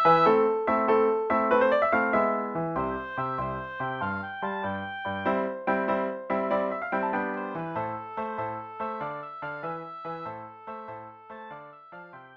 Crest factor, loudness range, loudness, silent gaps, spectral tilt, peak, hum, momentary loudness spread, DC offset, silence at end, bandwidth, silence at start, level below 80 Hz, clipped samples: 18 dB; 11 LU; -28 LUFS; none; -8 dB/octave; -10 dBFS; none; 19 LU; under 0.1%; 0 s; 7 kHz; 0 s; -60 dBFS; under 0.1%